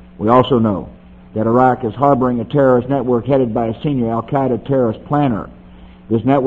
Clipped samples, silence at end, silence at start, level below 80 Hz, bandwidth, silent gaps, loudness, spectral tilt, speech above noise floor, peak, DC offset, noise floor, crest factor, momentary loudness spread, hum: under 0.1%; 0 s; 0.2 s; -42 dBFS; 4.3 kHz; none; -16 LUFS; -10 dB/octave; 24 dB; 0 dBFS; under 0.1%; -39 dBFS; 16 dB; 8 LU; none